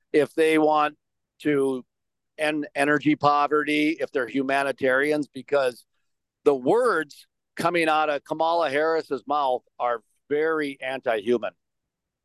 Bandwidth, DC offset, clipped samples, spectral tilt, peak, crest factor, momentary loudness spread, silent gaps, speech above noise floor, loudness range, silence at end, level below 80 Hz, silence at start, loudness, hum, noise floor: 12.5 kHz; under 0.1%; under 0.1%; -5 dB/octave; -6 dBFS; 18 dB; 7 LU; none; 60 dB; 2 LU; 0.75 s; -74 dBFS; 0.15 s; -24 LUFS; none; -83 dBFS